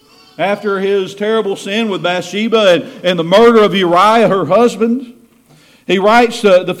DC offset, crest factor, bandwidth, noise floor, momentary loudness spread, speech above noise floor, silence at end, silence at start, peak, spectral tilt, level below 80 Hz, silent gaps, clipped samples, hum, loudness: under 0.1%; 12 dB; 15.5 kHz; -46 dBFS; 8 LU; 35 dB; 0 s; 0.4 s; 0 dBFS; -5 dB/octave; -52 dBFS; none; under 0.1%; none; -12 LUFS